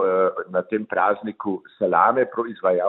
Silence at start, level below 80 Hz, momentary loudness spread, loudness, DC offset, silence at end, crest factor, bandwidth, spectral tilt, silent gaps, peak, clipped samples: 0 s; -70 dBFS; 10 LU; -22 LUFS; under 0.1%; 0 s; 18 dB; 4.1 kHz; -10.5 dB/octave; none; -4 dBFS; under 0.1%